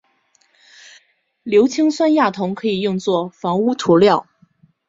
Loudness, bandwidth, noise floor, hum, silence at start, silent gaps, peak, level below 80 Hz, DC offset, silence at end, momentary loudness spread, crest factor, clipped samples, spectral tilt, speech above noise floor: -17 LUFS; 7.8 kHz; -61 dBFS; none; 1.45 s; none; -2 dBFS; -60 dBFS; under 0.1%; 0.65 s; 8 LU; 16 dB; under 0.1%; -6 dB/octave; 45 dB